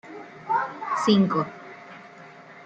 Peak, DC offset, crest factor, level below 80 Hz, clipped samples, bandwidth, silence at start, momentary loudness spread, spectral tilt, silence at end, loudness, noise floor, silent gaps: -6 dBFS; under 0.1%; 20 dB; -70 dBFS; under 0.1%; 9 kHz; 0.05 s; 25 LU; -6 dB/octave; 0 s; -24 LUFS; -46 dBFS; none